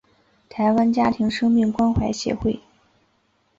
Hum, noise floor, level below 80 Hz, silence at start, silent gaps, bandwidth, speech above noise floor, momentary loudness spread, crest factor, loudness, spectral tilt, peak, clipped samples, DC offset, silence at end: none; -65 dBFS; -42 dBFS; 0.55 s; none; 7.8 kHz; 45 dB; 8 LU; 14 dB; -21 LUFS; -6.5 dB/octave; -8 dBFS; under 0.1%; under 0.1%; 1 s